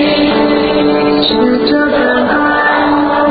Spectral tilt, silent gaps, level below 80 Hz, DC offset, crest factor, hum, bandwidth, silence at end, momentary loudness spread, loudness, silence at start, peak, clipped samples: -8.5 dB/octave; none; -38 dBFS; under 0.1%; 10 dB; none; 5 kHz; 0 s; 1 LU; -10 LUFS; 0 s; 0 dBFS; under 0.1%